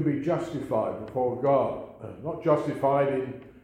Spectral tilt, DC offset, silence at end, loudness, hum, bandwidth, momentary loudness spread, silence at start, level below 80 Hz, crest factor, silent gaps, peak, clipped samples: -8.5 dB/octave; under 0.1%; 0.05 s; -27 LUFS; none; 11 kHz; 13 LU; 0 s; -60 dBFS; 18 dB; none; -10 dBFS; under 0.1%